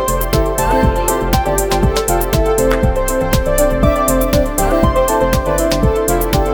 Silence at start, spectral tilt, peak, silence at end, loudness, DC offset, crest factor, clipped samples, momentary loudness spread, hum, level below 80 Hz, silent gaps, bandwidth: 0 s; -5 dB/octave; 0 dBFS; 0 s; -14 LUFS; under 0.1%; 14 dB; under 0.1%; 2 LU; none; -20 dBFS; none; 19 kHz